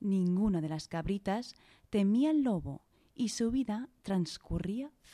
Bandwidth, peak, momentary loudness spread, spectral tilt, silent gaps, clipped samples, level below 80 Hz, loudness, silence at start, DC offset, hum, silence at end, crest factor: 12.5 kHz; -18 dBFS; 10 LU; -6.5 dB/octave; none; under 0.1%; -52 dBFS; -33 LUFS; 0 s; under 0.1%; none; 0.25 s; 14 dB